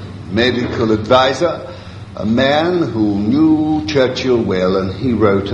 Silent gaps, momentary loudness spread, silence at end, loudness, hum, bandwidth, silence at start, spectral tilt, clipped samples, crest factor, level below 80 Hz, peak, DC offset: none; 9 LU; 0 s; -15 LUFS; none; 8.8 kHz; 0 s; -6.5 dB/octave; under 0.1%; 14 dB; -38 dBFS; 0 dBFS; under 0.1%